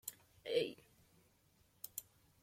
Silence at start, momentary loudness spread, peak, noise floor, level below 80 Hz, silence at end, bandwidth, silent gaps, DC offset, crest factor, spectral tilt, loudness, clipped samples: 0.05 s; 15 LU; -24 dBFS; -73 dBFS; -80 dBFS; 0.4 s; 16.5 kHz; none; under 0.1%; 24 dB; -2.5 dB/octave; -44 LUFS; under 0.1%